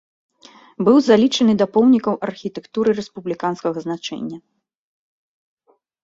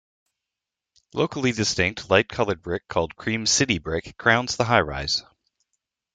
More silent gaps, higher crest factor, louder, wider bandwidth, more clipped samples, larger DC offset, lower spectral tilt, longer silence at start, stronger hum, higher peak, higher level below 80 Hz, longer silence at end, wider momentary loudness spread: neither; second, 18 dB vs 24 dB; first, -18 LUFS vs -23 LUFS; second, 7.8 kHz vs 10.5 kHz; neither; neither; first, -6 dB/octave vs -3.5 dB/octave; second, 0.8 s vs 1.15 s; neither; about the same, -2 dBFS vs -2 dBFS; second, -62 dBFS vs -50 dBFS; first, 1.65 s vs 0.95 s; first, 15 LU vs 7 LU